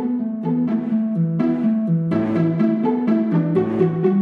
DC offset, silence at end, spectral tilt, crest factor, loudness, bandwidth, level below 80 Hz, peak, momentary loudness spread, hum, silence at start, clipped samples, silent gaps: under 0.1%; 0 s; -11 dB/octave; 14 dB; -20 LUFS; 4.7 kHz; -62 dBFS; -6 dBFS; 3 LU; none; 0 s; under 0.1%; none